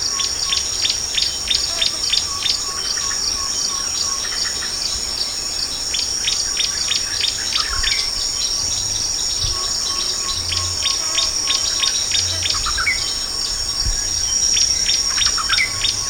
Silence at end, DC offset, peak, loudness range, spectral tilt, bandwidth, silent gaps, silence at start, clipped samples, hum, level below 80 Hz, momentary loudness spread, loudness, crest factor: 0 s; under 0.1%; -2 dBFS; 2 LU; 0.5 dB/octave; 17.5 kHz; none; 0 s; under 0.1%; none; -36 dBFS; 4 LU; -17 LUFS; 18 dB